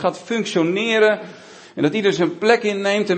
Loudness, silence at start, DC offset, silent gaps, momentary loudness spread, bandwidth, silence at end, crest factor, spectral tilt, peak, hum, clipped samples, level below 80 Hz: -19 LUFS; 0 s; under 0.1%; none; 9 LU; 8.8 kHz; 0 s; 18 dB; -5 dB/octave; -2 dBFS; none; under 0.1%; -68 dBFS